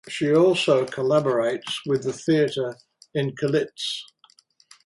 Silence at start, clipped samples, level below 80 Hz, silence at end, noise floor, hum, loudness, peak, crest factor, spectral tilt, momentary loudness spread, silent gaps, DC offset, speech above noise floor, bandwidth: 0.05 s; under 0.1%; -68 dBFS; 0.8 s; -58 dBFS; none; -23 LUFS; -6 dBFS; 16 dB; -5.5 dB/octave; 11 LU; none; under 0.1%; 35 dB; 11.5 kHz